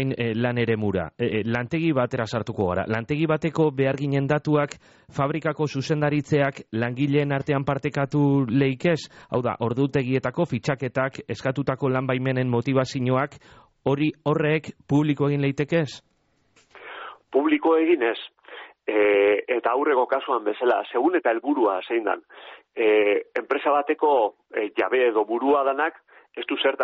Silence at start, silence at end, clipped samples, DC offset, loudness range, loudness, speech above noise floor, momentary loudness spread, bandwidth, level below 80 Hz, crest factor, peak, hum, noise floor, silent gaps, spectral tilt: 0 s; 0 s; under 0.1%; under 0.1%; 3 LU; -23 LUFS; 40 dB; 8 LU; 8 kHz; -58 dBFS; 14 dB; -8 dBFS; none; -63 dBFS; none; -5.5 dB/octave